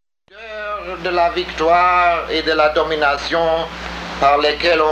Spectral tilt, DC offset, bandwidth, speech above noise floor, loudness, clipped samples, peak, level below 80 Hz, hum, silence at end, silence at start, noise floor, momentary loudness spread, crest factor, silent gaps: -4 dB/octave; under 0.1%; 9.2 kHz; 23 dB; -16 LUFS; under 0.1%; -4 dBFS; -40 dBFS; none; 0 s; 0.35 s; -39 dBFS; 12 LU; 14 dB; none